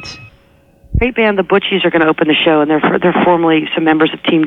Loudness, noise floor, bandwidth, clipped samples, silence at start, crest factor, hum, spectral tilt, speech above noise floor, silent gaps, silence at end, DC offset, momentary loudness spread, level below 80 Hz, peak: -12 LUFS; -48 dBFS; 7 kHz; under 0.1%; 0 s; 12 dB; none; -7 dB/octave; 36 dB; none; 0 s; under 0.1%; 4 LU; -32 dBFS; 0 dBFS